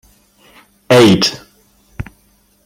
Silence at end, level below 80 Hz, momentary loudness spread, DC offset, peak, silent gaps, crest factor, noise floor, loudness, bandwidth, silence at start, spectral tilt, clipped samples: 0.65 s; -44 dBFS; 24 LU; under 0.1%; 0 dBFS; none; 16 dB; -54 dBFS; -10 LUFS; 16.5 kHz; 0.9 s; -5 dB/octave; under 0.1%